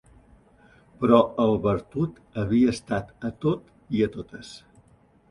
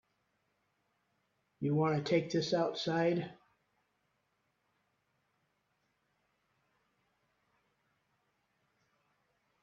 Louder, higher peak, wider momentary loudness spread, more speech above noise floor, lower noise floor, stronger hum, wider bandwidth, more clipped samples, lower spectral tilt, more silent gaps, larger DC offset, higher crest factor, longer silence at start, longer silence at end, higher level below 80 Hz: first, -25 LUFS vs -33 LUFS; first, -4 dBFS vs -18 dBFS; first, 17 LU vs 7 LU; second, 35 dB vs 48 dB; second, -58 dBFS vs -80 dBFS; neither; first, 11 kHz vs 7.4 kHz; neither; about the same, -7.5 dB/octave vs -6.5 dB/octave; neither; neither; about the same, 22 dB vs 22 dB; second, 1 s vs 1.6 s; second, 0.75 s vs 6.3 s; first, -52 dBFS vs -78 dBFS